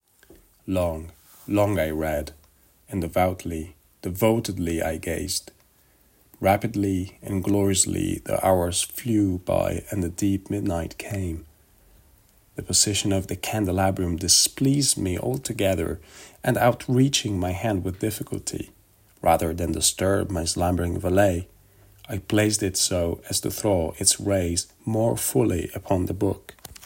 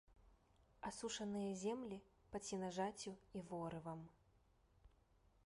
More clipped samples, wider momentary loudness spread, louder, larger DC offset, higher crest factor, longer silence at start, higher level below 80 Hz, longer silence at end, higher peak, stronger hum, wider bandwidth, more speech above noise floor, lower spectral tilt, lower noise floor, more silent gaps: neither; first, 12 LU vs 9 LU; first, -24 LUFS vs -48 LUFS; neither; about the same, 22 dB vs 18 dB; first, 0.65 s vs 0.1 s; first, -48 dBFS vs -74 dBFS; second, 0 s vs 0.55 s; first, -4 dBFS vs -32 dBFS; neither; first, 16.5 kHz vs 11.5 kHz; first, 36 dB vs 28 dB; about the same, -4 dB/octave vs -4.5 dB/octave; second, -60 dBFS vs -75 dBFS; neither